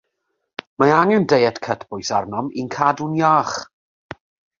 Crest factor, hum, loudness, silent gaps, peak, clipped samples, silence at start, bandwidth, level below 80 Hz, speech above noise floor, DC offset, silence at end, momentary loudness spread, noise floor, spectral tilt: 18 dB; none; -18 LUFS; none; -2 dBFS; under 0.1%; 0.8 s; 7.6 kHz; -58 dBFS; 56 dB; under 0.1%; 0.95 s; 21 LU; -74 dBFS; -5.5 dB/octave